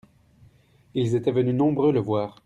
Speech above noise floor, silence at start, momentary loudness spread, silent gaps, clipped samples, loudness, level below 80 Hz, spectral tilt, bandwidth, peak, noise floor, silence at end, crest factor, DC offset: 35 dB; 0.95 s; 7 LU; none; under 0.1%; -23 LUFS; -60 dBFS; -8.5 dB/octave; 10 kHz; -10 dBFS; -57 dBFS; 0.15 s; 14 dB; under 0.1%